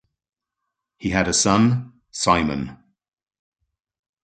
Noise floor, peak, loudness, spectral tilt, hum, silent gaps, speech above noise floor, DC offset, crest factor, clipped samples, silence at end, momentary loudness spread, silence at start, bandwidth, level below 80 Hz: -82 dBFS; -2 dBFS; -20 LUFS; -4 dB/octave; none; none; 62 dB; under 0.1%; 22 dB; under 0.1%; 1.5 s; 14 LU; 1 s; 9.4 kHz; -46 dBFS